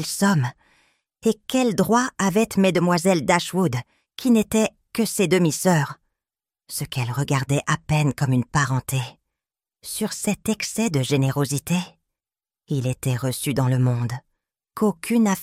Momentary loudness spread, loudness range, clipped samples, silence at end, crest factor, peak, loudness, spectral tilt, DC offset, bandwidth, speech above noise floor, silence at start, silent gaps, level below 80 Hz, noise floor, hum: 10 LU; 4 LU; under 0.1%; 0 s; 18 dB; -4 dBFS; -22 LUFS; -5.5 dB/octave; under 0.1%; 16 kHz; over 69 dB; 0 s; none; -54 dBFS; under -90 dBFS; none